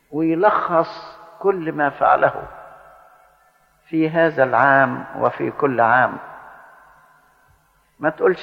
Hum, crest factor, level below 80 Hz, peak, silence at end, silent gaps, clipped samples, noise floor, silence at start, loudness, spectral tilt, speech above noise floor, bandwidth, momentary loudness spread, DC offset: none; 18 dB; -58 dBFS; -2 dBFS; 0 s; none; under 0.1%; -58 dBFS; 0.1 s; -18 LUFS; -8 dB/octave; 41 dB; 6.2 kHz; 15 LU; under 0.1%